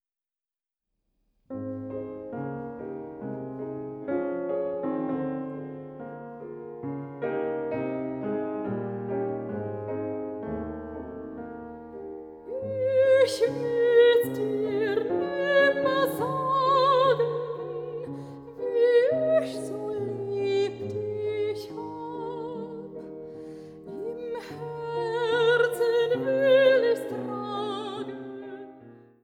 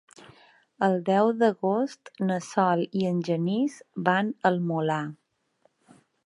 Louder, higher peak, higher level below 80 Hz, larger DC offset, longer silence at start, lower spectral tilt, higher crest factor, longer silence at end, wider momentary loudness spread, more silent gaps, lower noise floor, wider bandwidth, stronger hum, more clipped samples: about the same, -27 LUFS vs -26 LUFS; second, -10 dBFS vs -6 dBFS; first, -62 dBFS vs -76 dBFS; neither; first, 1.5 s vs 0.8 s; about the same, -6 dB/octave vs -7 dB/octave; about the same, 18 dB vs 20 dB; second, 0.25 s vs 1.1 s; first, 19 LU vs 7 LU; neither; first, under -90 dBFS vs -68 dBFS; first, 17 kHz vs 11 kHz; neither; neither